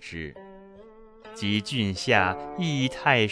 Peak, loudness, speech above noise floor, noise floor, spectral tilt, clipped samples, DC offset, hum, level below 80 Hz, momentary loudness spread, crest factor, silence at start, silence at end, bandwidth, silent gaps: -4 dBFS; -25 LUFS; 24 dB; -49 dBFS; -5 dB/octave; under 0.1%; under 0.1%; none; -56 dBFS; 17 LU; 22 dB; 0 s; 0 s; 11 kHz; none